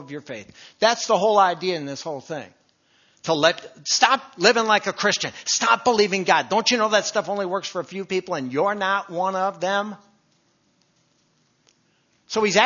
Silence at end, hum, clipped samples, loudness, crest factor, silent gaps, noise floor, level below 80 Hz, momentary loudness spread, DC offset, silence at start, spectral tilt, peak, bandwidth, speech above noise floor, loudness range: 0 s; none; under 0.1%; -21 LUFS; 22 dB; none; -65 dBFS; -72 dBFS; 13 LU; under 0.1%; 0 s; -2.5 dB/octave; 0 dBFS; 7.4 kHz; 43 dB; 8 LU